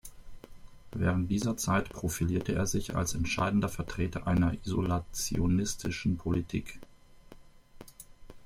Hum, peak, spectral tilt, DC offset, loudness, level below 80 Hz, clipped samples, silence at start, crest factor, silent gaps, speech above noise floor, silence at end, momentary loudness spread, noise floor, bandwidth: none; -14 dBFS; -5.5 dB/octave; under 0.1%; -31 LUFS; -46 dBFS; under 0.1%; 0.05 s; 18 dB; none; 23 dB; 0 s; 9 LU; -53 dBFS; 16 kHz